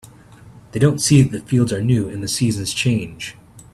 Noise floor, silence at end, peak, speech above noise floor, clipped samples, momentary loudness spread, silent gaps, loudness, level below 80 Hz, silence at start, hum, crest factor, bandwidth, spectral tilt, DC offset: -43 dBFS; 0.15 s; 0 dBFS; 26 dB; under 0.1%; 16 LU; none; -18 LUFS; -48 dBFS; 0.45 s; none; 18 dB; 13.5 kHz; -5.5 dB/octave; under 0.1%